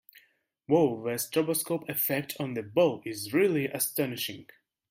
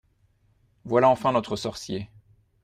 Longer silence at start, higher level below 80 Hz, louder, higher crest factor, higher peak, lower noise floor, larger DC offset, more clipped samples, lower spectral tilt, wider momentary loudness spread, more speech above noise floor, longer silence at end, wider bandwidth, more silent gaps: second, 0.7 s vs 0.85 s; second, -74 dBFS vs -58 dBFS; second, -29 LUFS vs -24 LUFS; about the same, 18 dB vs 20 dB; second, -10 dBFS vs -6 dBFS; about the same, -67 dBFS vs -65 dBFS; neither; neither; about the same, -4.5 dB/octave vs -5.5 dB/octave; second, 9 LU vs 14 LU; about the same, 39 dB vs 41 dB; about the same, 0.45 s vs 0.55 s; first, 16.5 kHz vs 14.5 kHz; neither